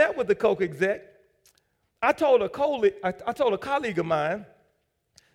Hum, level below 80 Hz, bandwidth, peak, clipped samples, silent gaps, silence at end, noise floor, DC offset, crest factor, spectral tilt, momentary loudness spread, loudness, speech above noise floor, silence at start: none; -62 dBFS; 13.5 kHz; -8 dBFS; under 0.1%; none; 0.9 s; -72 dBFS; under 0.1%; 18 dB; -6 dB/octave; 8 LU; -25 LUFS; 48 dB; 0 s